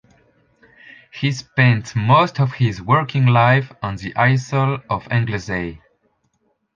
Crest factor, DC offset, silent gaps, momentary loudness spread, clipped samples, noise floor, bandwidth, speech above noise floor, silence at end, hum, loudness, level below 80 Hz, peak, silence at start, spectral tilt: 18 dB; under 0.1%; none; 11 LU; under 0.1%; -67 dBFS; 7.4 kHz; 49 dB; 1 s; none; -18 LUFS; -48 dBFS; -2 dBFS; 1.15 s; -6.5 dB/octave